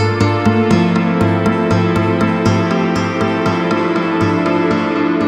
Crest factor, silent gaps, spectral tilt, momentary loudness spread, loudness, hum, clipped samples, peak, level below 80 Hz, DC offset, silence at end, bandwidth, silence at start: 14 dB; none; -7 dB/octave; 3 LU; -14 LUFS; none; under 0.1%; 0 dBFS; -40 dBFS; under 0.1%; 0 s; 10 kHz; 0 s